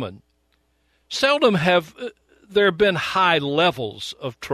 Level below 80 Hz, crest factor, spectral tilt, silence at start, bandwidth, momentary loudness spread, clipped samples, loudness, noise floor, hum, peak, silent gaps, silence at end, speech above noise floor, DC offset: -56 dBFS; 18 dB; -4.5 dB/octave; 0 s; 13.5 kHz; 16 LU; under 0.1%; -20 LUFS; -66 dBFS; none; -4 dBFS; none; 0 s; 46 dB; under 0.1%